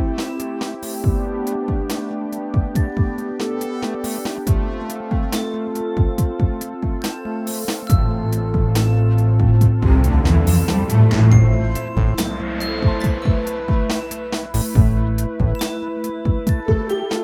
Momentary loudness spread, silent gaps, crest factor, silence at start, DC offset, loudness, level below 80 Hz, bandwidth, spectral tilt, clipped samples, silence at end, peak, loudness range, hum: 11 LU; none; 18 dB; 0 s; under 0.1%; -19 LUFS; -24 dBFS; 19.5 kHz; -7 dB/octave; under 0.1%; 0 s; 0 dBFS; 8 LU; none